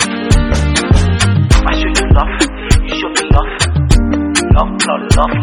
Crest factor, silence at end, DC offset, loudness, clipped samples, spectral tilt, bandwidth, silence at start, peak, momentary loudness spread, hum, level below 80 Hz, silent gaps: 10 dB; 0 s; under 0.1%; -12 LUFS; under 0.1%; -5 dB/octave; 12.5 kHz; 0 s; 0 dBFS; 4 LU; none; -14 dBFS; none